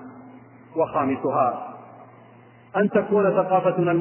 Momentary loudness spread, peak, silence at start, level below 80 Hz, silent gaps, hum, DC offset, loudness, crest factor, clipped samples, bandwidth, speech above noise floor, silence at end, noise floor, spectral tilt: 16 LU; -8 dBFS; 0 s; -66 dBFS; none; none; under 0.1%; -22 LUFS; 16 dB; under 0.1%; 3.2 kHz; 29 dB; 0 s; -50 dBFS; -11.5 dB/octave